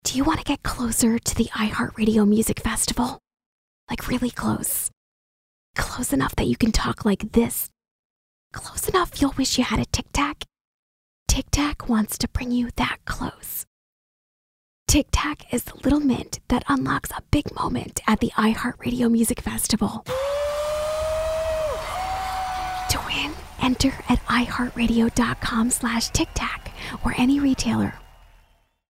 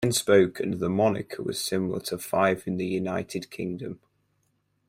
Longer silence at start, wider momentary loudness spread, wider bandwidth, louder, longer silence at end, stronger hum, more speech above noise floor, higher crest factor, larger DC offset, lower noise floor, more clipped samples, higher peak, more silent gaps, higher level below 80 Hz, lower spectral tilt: about the same, 0.05 s vs 0 s; second, 9 LU vs 13 LU; about the same, 16 kHz vs 16.5 kHz; first, -23 LUFS vs -26 LUFS; about the same, 0.9 s vs 0.95 s; neither; second, 37 dB vs 46 dB; about the same, 20 dB vs 20 dB; neither; second, -60 dBFS vs -72 dBFS; neither; about the same, -4 dBFS vs -6 dBFS; first, 3.46-3.87 s, 4.97-5.74 s, 7.91-8.50 s, 10.61-11.26 s, 13.67-14.86 s vs none; first, -36 dBFS vs -62 dBFS; about the same, -4 dB/octave vs -5 dB/octave